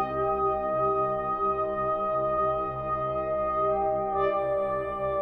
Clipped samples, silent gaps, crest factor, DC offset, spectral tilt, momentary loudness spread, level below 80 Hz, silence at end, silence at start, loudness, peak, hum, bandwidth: under 0.1%; none; 12 dB; under 0.1%; -9 dB/octave; 4 LU; -50 dBFS; 0 s; 0 s; -27 LUFS; -16 dBFS; none; 4.6 kHz